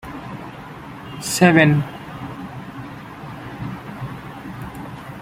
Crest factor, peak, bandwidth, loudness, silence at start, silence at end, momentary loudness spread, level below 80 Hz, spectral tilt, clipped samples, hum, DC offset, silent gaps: 22 dB; 0 dBFS; 16 kHz; -19 LUFS; 0 s; 0 s; 21 LU; -50 dBFS; -5.5 dB/octave; under 0.1%; none; under 0.1%; none